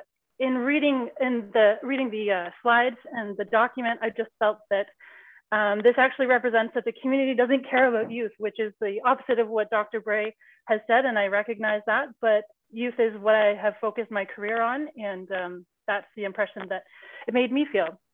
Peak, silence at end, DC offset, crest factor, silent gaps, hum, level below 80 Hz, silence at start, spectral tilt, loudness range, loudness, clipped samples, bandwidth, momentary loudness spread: -8 dBFS; 0.2 s; under 0.1%; 18 dB; none; none; -76 dBFS; 0.4 s; -7 dB/octave; 6 LU; -25 LUFS; under 0.1%; 4.1 kHz; 11 LU